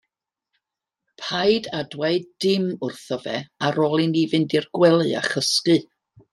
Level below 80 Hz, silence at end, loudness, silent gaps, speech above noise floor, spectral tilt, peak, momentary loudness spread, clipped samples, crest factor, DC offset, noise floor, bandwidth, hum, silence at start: -66 dBFS; 0.5 s; -21 LUFS; none; 63 dB; -5 dB/octave; -4 dBFS; 11 LU; under 0.1%; 18 dB; under 0.1%; -85 dBFS; 13 kHz; none; 1.2 s